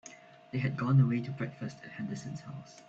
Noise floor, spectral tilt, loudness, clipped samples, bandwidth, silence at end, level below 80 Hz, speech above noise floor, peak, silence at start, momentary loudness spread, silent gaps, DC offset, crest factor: -54 dBFS; -7.5 dB/octave; -33 LUFS; under 0.1%; 7.8 kHz; 0.1 s; -68 dBFS; 21 dB; -14 dBFS; 0.05 s; 17 LU; none; under 0.1%; 18 dB